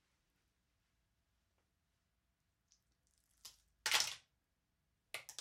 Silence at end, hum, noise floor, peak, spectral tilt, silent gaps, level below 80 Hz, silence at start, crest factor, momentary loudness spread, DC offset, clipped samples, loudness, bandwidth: 0.05 s; none; -85 dBFS; -14 dBFS; 2 dB/octave; none; -84 dBFS; 3.45 s; 34 dB; 24 LU; under 0.1%; under 0.1%; -38 LUFS; 16 kHz